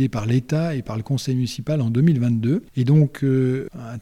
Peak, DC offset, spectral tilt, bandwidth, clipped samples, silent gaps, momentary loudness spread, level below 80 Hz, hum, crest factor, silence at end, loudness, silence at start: -6 dBFS; under 0.1%; -8 dB/octave; 12.5 kHz; under 0.1%; none; 8 LU; -50 dBFS; none; 14 dB; 0 s; -21 LUFS; 0 s